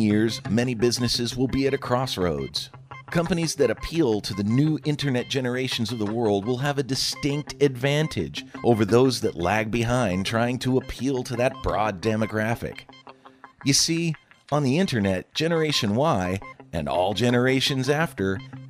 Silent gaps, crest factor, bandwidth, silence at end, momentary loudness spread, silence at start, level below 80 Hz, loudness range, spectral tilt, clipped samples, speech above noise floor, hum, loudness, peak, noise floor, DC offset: none; 20 dB; 15.5 kHz; 0 s; 7 LU; 0 s; -48 dBFS; 2 LU; -5 dB/octave; under 0.1%; 26 dB; none; -24 LUFS; -4 dBFS; -50 dBFS; under 0.1%